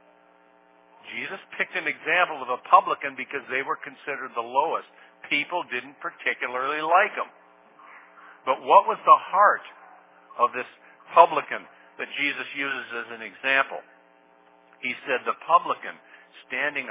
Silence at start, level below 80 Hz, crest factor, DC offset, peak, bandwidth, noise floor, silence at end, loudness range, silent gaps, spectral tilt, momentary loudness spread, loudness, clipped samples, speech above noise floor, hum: 1.05 s; under -90 dBFS; 24 dB; under 0.1%; -2 dBFS; 3.9 kHz; -58 dBFS; 0 s; 6 LU; none; 0.5 dB/octave; 16 LU; -24 LUFS; under 0.1%; 33 dB; none